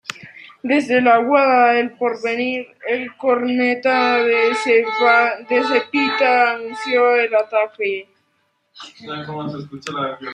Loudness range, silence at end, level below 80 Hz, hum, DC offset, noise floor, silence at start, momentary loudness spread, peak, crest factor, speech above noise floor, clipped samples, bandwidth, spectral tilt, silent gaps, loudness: 5 LU; 0 s; -72 dBFS; none; under 0.1%; -66 dBFS; 0.1 s; 15 LU; -2 dBFS; 16 dB; 49 dB; under 0.1%; 10.5 kHz; -4.5 dB/octave; none; -17 LUFS